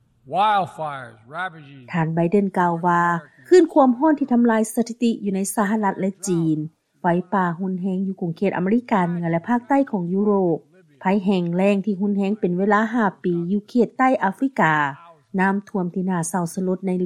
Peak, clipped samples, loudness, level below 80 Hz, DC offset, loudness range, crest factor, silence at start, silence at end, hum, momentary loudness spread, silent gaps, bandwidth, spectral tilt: -4 dBFS; under 0.1%; -21 LUFS; -66 dBFS; under 0.1%; 4 LU; 16 dB; 0.25 s; 0 s; none; 9 LU; none; 15.5 kHz; -6.5 dB/octave